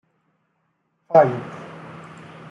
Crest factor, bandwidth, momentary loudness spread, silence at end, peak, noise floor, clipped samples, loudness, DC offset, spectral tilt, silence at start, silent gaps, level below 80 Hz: 22 dB; 7.8 kHz; 24 LU; 0.5 s; -2 dBFS; -70 dBFS; under 0.1%; -18 LUFS; under 0.1%; -8 dB/octave; 1.1 s; none; -70 dBFS